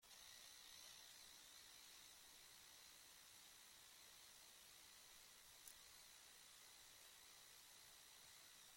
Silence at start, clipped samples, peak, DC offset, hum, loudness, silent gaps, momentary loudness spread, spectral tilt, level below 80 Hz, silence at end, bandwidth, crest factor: 0 s; under 0.1%; -40 dBFS; under 0.1%; none; -62 LUFS; none; 3 LU; 0.5 dB/octave; -88 dBFS; 0 s; 16.5 kHz; 26 dB